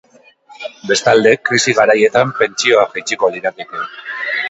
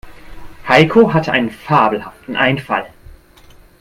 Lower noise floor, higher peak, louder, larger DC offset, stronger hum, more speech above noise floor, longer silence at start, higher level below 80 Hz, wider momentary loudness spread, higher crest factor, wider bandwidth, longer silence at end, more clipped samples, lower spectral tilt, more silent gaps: about the same, -45 dBFS vs -44 dBFS; about the same, 0 dBFS vs 0 dBFS; about the same, -13 LUFS vs -14 LUFS; neither; neither; about the same, 31 dB vs 30 dB; first, 0.5 s vs 0.05 s; second, -58 dBFS vs -44 dBFS; about the same, 14 LU vs 14 LU; about the same, 14 dB vs 16 dB; second, 8.2 kHz vs 15.5 kHz; second, 0 s vs 0.95 s; neither; second, -3 dB/octave vs -6.5 dB/octave; neither